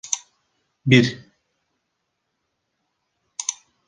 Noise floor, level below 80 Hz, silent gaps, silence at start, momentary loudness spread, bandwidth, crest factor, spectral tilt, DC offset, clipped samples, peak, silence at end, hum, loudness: -76 dBFS; -60 dBFS; none; 0.05 s; 17 LU; 10 kHz; 24 dB; -4.5 dB/octave; under 0.1%; under 0.1%; -2 dBFS; 0.35 s; none; -21 LUFS